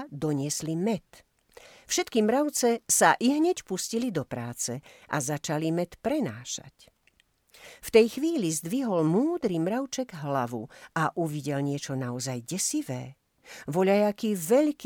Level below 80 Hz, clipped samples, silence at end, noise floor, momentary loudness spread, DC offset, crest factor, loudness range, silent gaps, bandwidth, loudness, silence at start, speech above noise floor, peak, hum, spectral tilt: -64 dBFS; under 0.1%; 0 s; -67 dBFS; 12 LU; under 0.1%; 22 dB; 6 LU; none; over 20 kHz; -27 LUFS; 0 s; 40 dB; -6 dBFS; none; -4.5 dB/octave